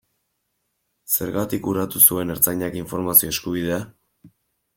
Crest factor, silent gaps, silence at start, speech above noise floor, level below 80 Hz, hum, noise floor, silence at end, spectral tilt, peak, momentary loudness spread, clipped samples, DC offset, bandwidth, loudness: 24 dB; none; 1.1 s; 53 dB; -54 dBFS; none; -74 dBFS; 0.5 s; -3.5 dB/octave; 0 dBFS; 13 LU; under 0.1%; under 0.1%; 17 kHz; -19 LUFS